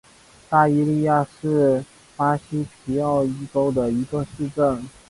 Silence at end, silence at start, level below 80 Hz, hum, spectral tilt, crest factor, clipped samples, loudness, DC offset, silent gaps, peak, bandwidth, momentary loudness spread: 0.2 s; 0.5 s; -50 dBFS; none; -8 dB/octave; 16 dB; under 0.1%; -22 LUFS; under 0.1%; none; -4 dBFS; 11.5 kHz; 9 LU